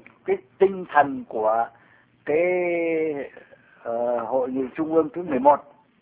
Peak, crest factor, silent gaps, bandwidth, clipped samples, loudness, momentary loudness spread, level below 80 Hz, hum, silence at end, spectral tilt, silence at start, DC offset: -2 dBFS; 22 dB; none; 4 kHz; under 0.1%; -23 LUFS; 11 LU; -64 dBFS; none; 0.4 s; -10 dB/octave; 0.25 s; under 0.1%